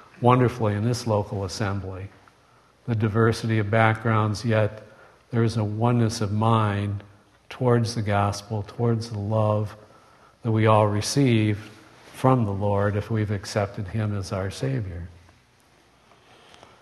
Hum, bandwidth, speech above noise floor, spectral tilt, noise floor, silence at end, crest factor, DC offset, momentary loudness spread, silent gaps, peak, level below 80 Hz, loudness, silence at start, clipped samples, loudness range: none; 12.5 kHz; 35 dB; -6.5 dB/octave; -58 dBFS; 1.7 s; 22 dB; under 0.1%; 13 LU; none; -2 dBFS; -54 dBFS; -24 LUFS; 0.2 s; under 0.1%; 4 LU